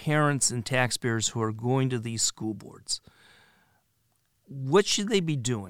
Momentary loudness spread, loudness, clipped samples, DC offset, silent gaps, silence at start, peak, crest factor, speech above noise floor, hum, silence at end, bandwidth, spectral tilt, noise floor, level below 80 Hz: 13 LU; -27 LUFS; under 0.1%; under 0.1%; none; 0 s; -8 dBFS; 20 dB; 45 dB; none; 0 s; 17 kHz; -4 dB/octave; -72 dBFS; -62 dBFS